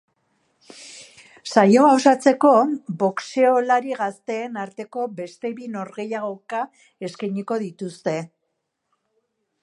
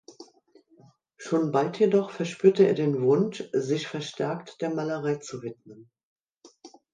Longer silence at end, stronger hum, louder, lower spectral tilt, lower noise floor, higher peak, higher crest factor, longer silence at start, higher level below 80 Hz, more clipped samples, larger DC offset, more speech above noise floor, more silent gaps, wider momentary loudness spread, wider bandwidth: first, 1.35 s vs 0.25 s; neither; first, -21 LUFS vs -26 LUFS; about the same, -5.5 dB/octave vs -6.5 dB/octave; first, -76 dBFS vs -60 dBFS; first, -2 dBFS vs -6 dBFS; about the same, 20 dB vs 20 dB; first, 0.75 s vs 0.1 s; about the same, -76 dBFS vs -76 dBFS; neither; neither; first, 56 dB vs 34 dB; second, none vs 6.03-6.16 s, 6.23-6.27 s, 6.37-6.41 s; first, 19 LU vs 11 LU; first, 11.5 kHz vs 9.4 kHz